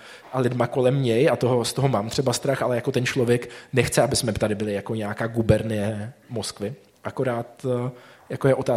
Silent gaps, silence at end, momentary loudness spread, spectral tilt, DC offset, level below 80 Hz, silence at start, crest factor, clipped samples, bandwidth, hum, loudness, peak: none; 0 s; 11 LU; -5.5 dB/octave; under 0.1%; -50 dBFS; 0 s; 20 dB; under 0.1%; 16 kHz; none; -24 LUFS; -2 dBFS